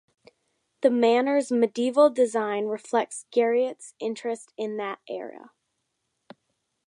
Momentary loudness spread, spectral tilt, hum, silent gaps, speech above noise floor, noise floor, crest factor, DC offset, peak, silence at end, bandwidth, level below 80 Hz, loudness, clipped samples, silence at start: 13 LU; -4 dB/octave; none; none; 54 dB; -78 dBFS; 18 dB; under 0.1%; -8 dBFS; 1.5 s; 11 kHz; -82 dBFS; -25 LUFS; under 0.1%; 0.8 s